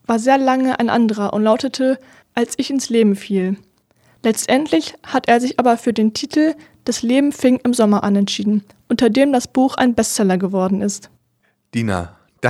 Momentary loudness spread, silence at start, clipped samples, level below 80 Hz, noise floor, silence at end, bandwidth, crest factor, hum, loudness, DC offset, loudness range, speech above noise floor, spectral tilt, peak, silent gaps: 9 LU; 0.1 s; under 0.1%; -54 dBFS; -64 dBFS; 0 s; 14.5 kHz; 16 dB; none; -17 LUFS; under 0.1%; 3 LU; 48 dB; -5 dB/octave; 0 dBFS; none